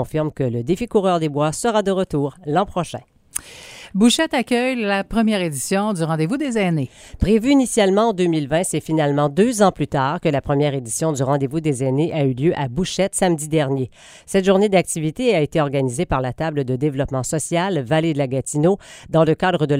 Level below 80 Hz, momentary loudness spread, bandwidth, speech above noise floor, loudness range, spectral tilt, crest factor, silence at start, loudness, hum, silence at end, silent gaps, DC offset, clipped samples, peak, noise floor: -42 dBFS; 7 LU; 16 kHz; 21 dB; 3 LU; -5.5 dB/octave; 18 dB; 0 s; -19 LUFS; none; 0 s; none; under 0.1%; under 0.1%; -2 dBFS; -40 dBFS